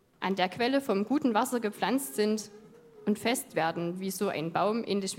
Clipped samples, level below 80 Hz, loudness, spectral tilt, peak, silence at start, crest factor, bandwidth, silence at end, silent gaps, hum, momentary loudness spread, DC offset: under 0.1%; -76 dBFS; -30 LUFS; -4.5 dB/octave; -10 dBFS; 0.2 s; 20 dB; 16.5 kHz; 0 s; none; none; 6 LU; under 0.1%